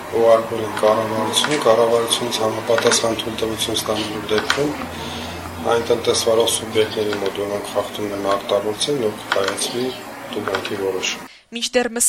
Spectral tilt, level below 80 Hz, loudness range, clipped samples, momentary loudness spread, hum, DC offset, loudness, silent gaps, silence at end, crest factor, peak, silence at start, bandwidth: -2.5 dB/octave; -52 dBFS; 4 LU; under 0.1%; 10 LU; none; under 0.1%; -20 LUFS; none; 0 s; 18 dB; -2 dBFS; 0 s; 16.5 kHz